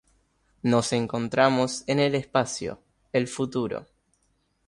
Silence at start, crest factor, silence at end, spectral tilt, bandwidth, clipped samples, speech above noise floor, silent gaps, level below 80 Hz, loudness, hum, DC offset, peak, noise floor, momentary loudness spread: 0.65 s; 20 dB; 0.85 s; -5 dB/octave; 11.5 kHz; under 0.1%; 45 dB; none; -60 dBFS; -26 LUFS; none; under 0.1%; -6 dBFS; -70 dBFS; 10 LU